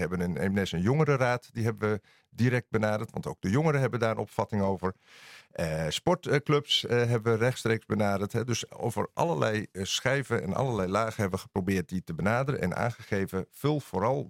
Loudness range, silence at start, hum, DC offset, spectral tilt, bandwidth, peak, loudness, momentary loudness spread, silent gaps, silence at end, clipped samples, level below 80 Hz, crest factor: 2 LU; 0 s; none; under 0.1%; -5.5 dB/octave; 16.5 kHz; -10 dBFS; -29 LUFS; 7 LU; none; 0 s; under 0.1%; -60 dBFS; 18 dB